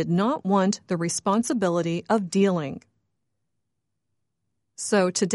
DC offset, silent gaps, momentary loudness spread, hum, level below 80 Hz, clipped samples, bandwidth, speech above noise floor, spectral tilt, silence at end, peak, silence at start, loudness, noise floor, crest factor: under 0.1%; none; 7 LU; none; -68 dBFS; under 0.1%; 11.5 kHz; 58 dB; -5 dB/octave; 0 s; -10 dBFS; 0 s; -24 LUFS; -81 dBFS; 16 dB